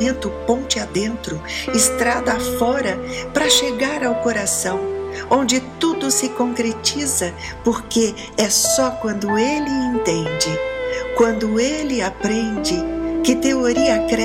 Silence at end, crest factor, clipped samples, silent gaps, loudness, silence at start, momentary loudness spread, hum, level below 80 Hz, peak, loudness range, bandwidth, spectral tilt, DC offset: 0 s; 16 dB; under 0.1%; none; -19 LUFS; 0 s; 8 LU; none; -40 dBFS; -2 dBFS; 2 LU; 16.5 kHz; -3 dB/octave; under 0.1%